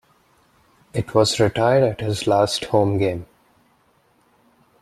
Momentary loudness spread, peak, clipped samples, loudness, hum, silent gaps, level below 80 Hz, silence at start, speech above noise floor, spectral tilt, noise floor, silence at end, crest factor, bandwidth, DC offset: 9 LU; -2 dBFS; under 0.1%; -20 LUFS; none; none; -52 dBFS; 0.95 s; 42 dB; -5.5 dB/octave; -60 dBFS; 1.55 s; 20 dB; 13.5 kHz; under 0.1%